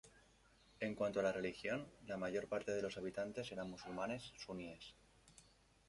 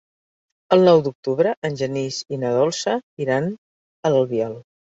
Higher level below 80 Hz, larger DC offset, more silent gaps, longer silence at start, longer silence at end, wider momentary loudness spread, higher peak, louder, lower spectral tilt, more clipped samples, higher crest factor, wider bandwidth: second, -72 dBFS vs -64 dBFS; neither; second, none vs 1.15-1.23 s, 1.57-1.62 s, 3.03-3.17 s, 3.58-4.03 s; second, 0.05 s vs 0.7 s; about the same, 0.45 s vs 0.35 s; about the same, 12 LU vs 11 LU; second, -26 dBFS vs -2 dBFS; second, -44 LUFS vs -20 LUFS; about the same, -5 dB/octave vs -5.5 dB/octave; neither; about the same, 20 dB vs 18 dB; first, 11.5 kHz vs 7.8 kHz